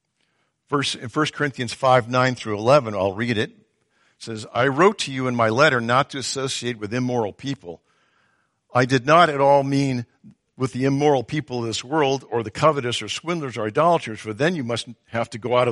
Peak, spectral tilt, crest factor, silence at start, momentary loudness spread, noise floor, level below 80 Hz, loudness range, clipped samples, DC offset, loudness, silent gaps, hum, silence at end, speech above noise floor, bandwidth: -2 dBFS; -5 dB/octave; 20 dB; 0.7 s; 11 LU; -69 dBFS; -60 dBFS; 3 LU; under 0.1%; under 0.1%; -21 LUFS; none; none; 0 s; 48 dB; 11.5 kHz